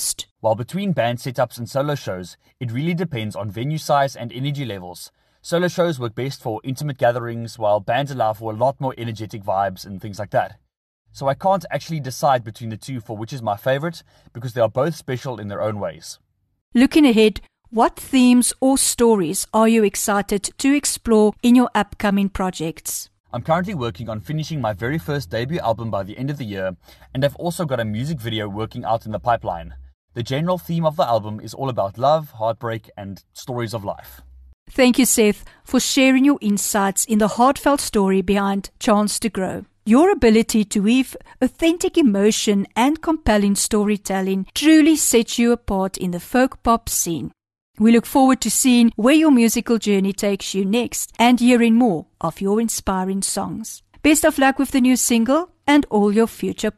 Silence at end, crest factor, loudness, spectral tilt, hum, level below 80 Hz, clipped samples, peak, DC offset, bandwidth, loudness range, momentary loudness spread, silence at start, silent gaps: 0.05 s; 16 dB; -19 LUFS; -4.5 dB/octave; none; -44 dBFS; under 0.1%; -4 dBFS; under 0.1%; 13 kHz; 8 LU; 14 LU; 0 s; 0.31-0.36 s, 10.77-11.05 s, 16.61-16.72 s, 23.20-23.24 s, 29.94-30.08 s, 34.54-34.66 s, 47.61-47.74 s